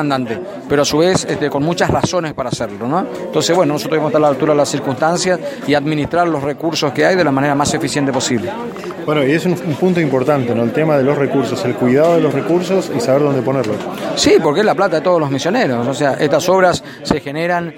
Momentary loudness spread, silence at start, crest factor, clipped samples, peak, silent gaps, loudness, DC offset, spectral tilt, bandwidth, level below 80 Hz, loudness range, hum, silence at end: 7 LU; 0 s; 14 dB; under 0.1%; 0 dBFS; none; -15 LUFS; under 0.1%; -5 dB/octave; 16.5 kHz; -46 dBFS; 2 LU; none; 0 s